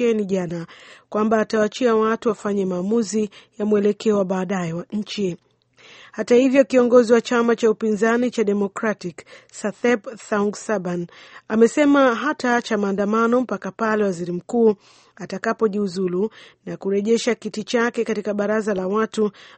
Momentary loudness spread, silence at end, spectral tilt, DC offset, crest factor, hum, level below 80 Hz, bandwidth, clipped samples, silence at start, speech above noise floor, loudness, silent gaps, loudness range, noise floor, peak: 13 LU; 0.15 s; -5.5 dB/octave; under 0.1%; 18 dB; none; -64 dBFS; 8.8 kHz; under 0.1%; 0 s; 30 dB; -21 LUFS; none; 5 LU; -51 dBFS; -2 dBFS